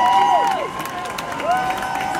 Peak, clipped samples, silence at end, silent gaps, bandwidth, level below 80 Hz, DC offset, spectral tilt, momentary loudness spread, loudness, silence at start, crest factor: -4 dBFS; under 0.1%; 0 s; none; 17 kHz; -50 dBFS; under 0.1%; -3 dB/octave; 11 LU; -20 LUFS; 0 s; 16 dB